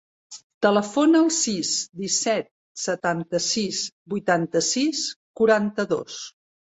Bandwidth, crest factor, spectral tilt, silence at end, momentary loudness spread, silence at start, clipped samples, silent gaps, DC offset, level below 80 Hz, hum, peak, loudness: 8.4 kHz; 18 dB; -3 dB/octave; 0.45 s; 15 LU; 0.3 s; under 0.1%; 0.44-0.61 s, 2.51-2.75 s, 3.92-4.06 s, 5.16-5.34 s; under 0.1%; -66 dBFS; none; -6 dBFS; -23 LUFS